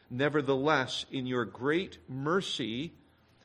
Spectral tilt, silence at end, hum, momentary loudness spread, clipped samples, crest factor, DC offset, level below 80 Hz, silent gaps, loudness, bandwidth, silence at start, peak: -5 dB/octave; 0.55 s; none; 10 LU; under 0.1%; 20 dB; under 0.1%; -66 dBFS; none; -31 LUFS; 11.5 kHz; 0.1 s; -12 dBFS